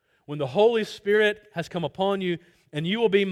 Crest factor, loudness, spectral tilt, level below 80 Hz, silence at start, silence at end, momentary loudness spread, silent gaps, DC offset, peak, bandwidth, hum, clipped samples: 16 dB; -25 LUFS; -6 dB/octave; -66 dBFS; 0.3 s; 0 s; 12 LU; none; under 0.1%; -8 dBFS; 13 kHz; none; under 0.1%